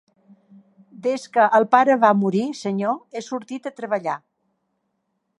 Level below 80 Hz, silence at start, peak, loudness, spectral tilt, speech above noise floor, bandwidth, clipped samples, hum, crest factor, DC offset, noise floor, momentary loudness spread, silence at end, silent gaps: -78 dBFS; 1 s; -2 dBFS; -20 LUFS; -6 dB/octave; 54 dB; 11 kHz; under 0.1%; none; 20 dB; under 0.1%; -74 dBFS; 15 LU; 1.2 s; none